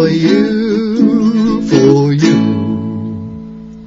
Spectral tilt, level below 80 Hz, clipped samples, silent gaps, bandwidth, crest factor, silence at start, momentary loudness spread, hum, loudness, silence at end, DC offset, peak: -7 dB/octave; -42 dBFS; under 0.1%; none; 7.6 kHz; 12 dB; 0 s; 15 LU; none; -12 LUFS; 0 s; under 0.1%; 0 dBFS